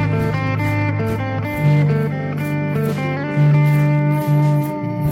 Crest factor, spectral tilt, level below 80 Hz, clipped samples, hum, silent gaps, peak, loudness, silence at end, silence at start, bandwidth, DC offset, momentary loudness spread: 10 dB; -8.5 dB/octave; -44 dBFS; under 0.1%; none; none; -6 dBFS; -18 LUFS; 0 s; 0 s; 15 kHz; under 0.1%; 7 LU